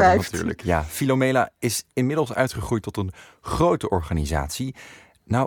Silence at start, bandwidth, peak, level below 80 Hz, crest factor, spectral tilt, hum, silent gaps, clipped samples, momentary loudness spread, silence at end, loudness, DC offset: 0 s; 19 kHz; -4 dBFS; -38 dBFS; 18 dB; -5.5 dB/octave; none; none; under 0.1%; 10 LU; 0 s; -24 LUFS; under 0.1%